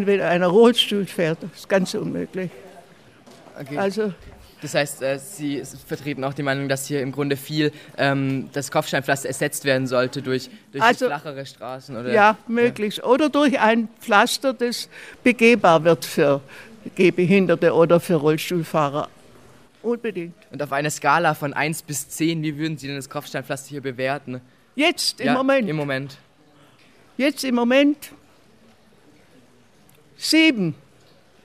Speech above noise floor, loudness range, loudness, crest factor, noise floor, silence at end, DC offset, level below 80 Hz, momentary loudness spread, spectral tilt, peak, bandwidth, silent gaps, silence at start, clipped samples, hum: 34 dB; 8 LU; -21 LUFS; 20 dB; -55 dBFS; 0.7 s; under 0.1%; -62 dBFS; 15 LU; -4.5 dB/octave; -2 dBFS; 16 kHz; none; 0 s; under 0.1%; none